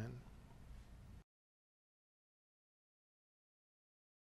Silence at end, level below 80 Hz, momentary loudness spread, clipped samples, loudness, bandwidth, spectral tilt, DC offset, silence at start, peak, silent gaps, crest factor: 3 s; -66 dBFS; 8 LU; under 0.1%; -59 LUFS; 13 kHz; -7 dB/octave; under 0.1%; 0 s; -34 dBFS; none; 24 dB